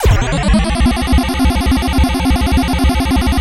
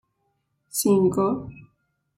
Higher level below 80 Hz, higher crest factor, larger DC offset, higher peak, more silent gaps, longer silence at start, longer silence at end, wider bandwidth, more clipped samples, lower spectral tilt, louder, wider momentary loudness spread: first, -16 dBFS vs -58 dBFS; about the same, 12 dB vs 16 dB; neither; first, 0 dBFS vs -10 dBFS; neither; second, 0 s vs 0.75 s; second, 0 s vs 0.55 s; about the same, 16.5 kHz vs 16.5 kHz; neither; about the same, -5.5 dB/octave vs -6 dB/octave; first, -14 LUFS vs -23 LUFS; second, 1 LU vs 12 LU